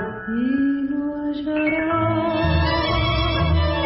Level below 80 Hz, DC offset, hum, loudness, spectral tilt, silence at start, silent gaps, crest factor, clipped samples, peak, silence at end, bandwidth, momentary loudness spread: -30 dBFS; under 0.1%; none; -21 LUFS; -10.5 dB/octave; 0 s; none; 12 dB; under 0.1%; -8 dBFS; 0 s; 5.8 kHz; 5 LU